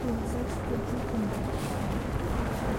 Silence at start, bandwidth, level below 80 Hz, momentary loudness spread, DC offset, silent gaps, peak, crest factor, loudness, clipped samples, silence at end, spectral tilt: 0 s; 16.5 kHz; -38 dBFS; 1 LU; under 0.1%; none; -18 dBFS; 14 dB; -32 LUFS; under 0.1%; 0 s; -6.5 dB/octave